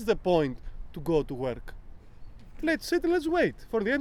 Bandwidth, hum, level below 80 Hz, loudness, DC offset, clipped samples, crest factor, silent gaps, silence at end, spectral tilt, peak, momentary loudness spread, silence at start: 16 kHz; none; -44 dBFS; -28 LUFS; under 0.1%; under 0.1%; 18 dB; none; 0 s; -6 dB/octave; -10 dBFS; 16 LU; 0 s